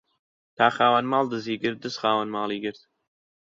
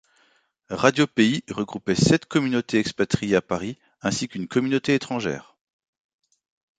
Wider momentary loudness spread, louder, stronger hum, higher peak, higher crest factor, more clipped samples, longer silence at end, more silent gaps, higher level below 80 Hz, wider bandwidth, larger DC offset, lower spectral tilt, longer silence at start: about the same, 9 LU vs 10 LU; about the same, -24 LUFS vs -23 LUFS; neither; about the same, -4 dBFS vs -2 dBFS; about the same, 22 dB vs 22 dB; neither; second, 0.65 s vs 1.35 s; neither; second, -70 dBFS vs -54 dBFS; second, 7.8 kHz vs 9.4 kHz; neither; about the same, -5 dB/octave vs -5 dB/octave; about the same, 0.6 s vs 0.7 s